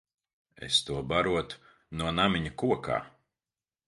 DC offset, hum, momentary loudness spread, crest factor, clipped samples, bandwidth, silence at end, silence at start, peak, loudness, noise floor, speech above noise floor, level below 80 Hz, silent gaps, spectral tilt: under 0.1%; none; 15 LU; 22 dB; under 0.1%; 11.5 kHz; 0.8 s; 0.6 s; -8 dBFS; -29 LUFS; under -90 dBFS; over 61 dB; -52 dBFS; none; -4.5 dB/octave